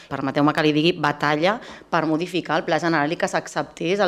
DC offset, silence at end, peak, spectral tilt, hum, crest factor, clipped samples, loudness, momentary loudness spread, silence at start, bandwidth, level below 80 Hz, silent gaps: under 0.1%; 0 s; -4 dBFS; -5.5 dB/octave; none; 18 dB; under 0.1%; -22 LUFS; 7 LU; 0 s; 13 kHz; -60 dBFS; none